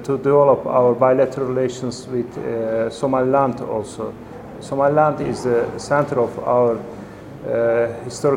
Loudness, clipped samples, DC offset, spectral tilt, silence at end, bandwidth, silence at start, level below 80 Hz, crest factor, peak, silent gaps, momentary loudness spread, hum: -19 LUFS; under 0.1%; under 0.1%; -6.5 dB/octave; 0 s; 11.5 kHz; 0 s; -52 dBFS; 18 dB; -2 dBFS; none; 15 LU; none